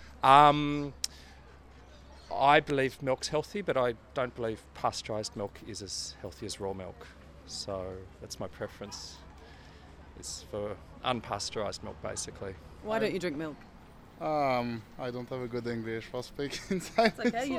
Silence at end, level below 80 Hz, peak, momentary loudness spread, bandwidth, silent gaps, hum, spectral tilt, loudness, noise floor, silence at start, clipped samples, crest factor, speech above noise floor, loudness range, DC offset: 0 s; -56 dBFS; -6 dBFS; 19 LU; 16 kHz; none; none; -4.5 dB/octave; -31 LUFS; -53 dBFS; 0 s; under 0.1%; 26 dB; 22 dB; 11 LU; under 0.1%